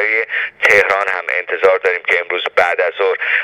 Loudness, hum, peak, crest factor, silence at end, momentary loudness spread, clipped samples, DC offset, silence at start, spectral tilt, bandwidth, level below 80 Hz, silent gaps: -14 LUFS; none; 0 dBFS; 16 dB; 0 s; 6 LU; under 0.1%; under 0.1%; 0 s; -2 dB/octave; 15.5 kHz; -58 dBFS; none